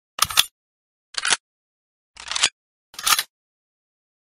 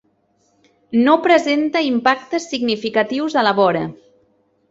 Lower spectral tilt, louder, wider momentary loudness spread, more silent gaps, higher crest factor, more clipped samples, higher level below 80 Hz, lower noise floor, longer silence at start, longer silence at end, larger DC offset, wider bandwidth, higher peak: second, 2 dB/octave vs -5 dB/octave; second, -21 LUFS vs -17 LUFS; first, 17 LU vs 8 LU; first, 0.51-1.13 s, 1.40-2.14 s, 2.52-2.93 s vs none; first, 26 dB vs 16 dB; neither; about the same, -58 dBFS vs -62 dBFS; first, under -90 dBFS vs -62 dBFS; second, 0.2 s vs 0.9 s; first, 1.05 s vs 0.75 s; neither; first, 16 kHz vs 8 kHz; about the same, 0 dBFS vs -2 dBFS